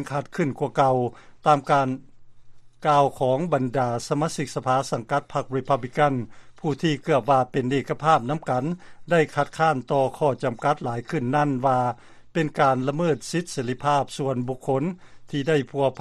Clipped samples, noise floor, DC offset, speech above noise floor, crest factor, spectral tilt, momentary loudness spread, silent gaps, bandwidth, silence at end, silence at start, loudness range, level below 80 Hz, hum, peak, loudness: under 0.1%; -43 dBFS; under 0.1%; 20 dB; 18 dB; -6 dB/octave; 8 LU; none; 13 kHz; 0 s; 0 s; 2 LU; -56 dBFS; none; -4 dBFS; -24 LUFS